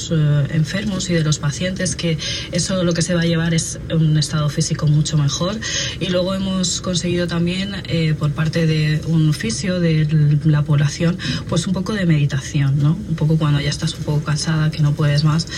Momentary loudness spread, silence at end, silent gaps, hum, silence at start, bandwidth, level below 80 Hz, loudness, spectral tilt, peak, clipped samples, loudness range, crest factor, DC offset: 4 LU; 0 s; none; none; 0 s; 11.5 kHz; -38 dBFS; -18 LUFS; -5.5 dB/octave; -4 dBFS; under 0.1%; 2 LU; 12 dB; under 0.1%